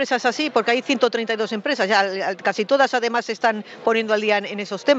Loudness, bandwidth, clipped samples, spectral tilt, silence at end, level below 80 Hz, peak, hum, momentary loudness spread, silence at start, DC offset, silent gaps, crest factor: -21 LUFS; 8 kHz; under 0.1%; -3.5 dB/octave; 0 s; -76 dBFS; -4 dBFS; none; 5 LU; 0 s; under 0.1%; none; 18 dB